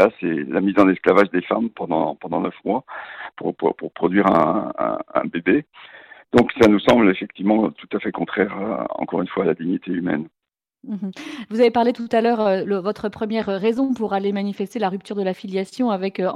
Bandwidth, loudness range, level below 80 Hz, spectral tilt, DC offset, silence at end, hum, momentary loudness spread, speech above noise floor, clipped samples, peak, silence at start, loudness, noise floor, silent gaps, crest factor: 12 kHz; 4 LU; -54 dBFS; -7 dB/octave; under 0.1%; 0 s; none; 11 LU; 47 dB; under 0.1%; -2 dBFS; 0 s; -20 LUFS; -67 dBFS; none; 18 dB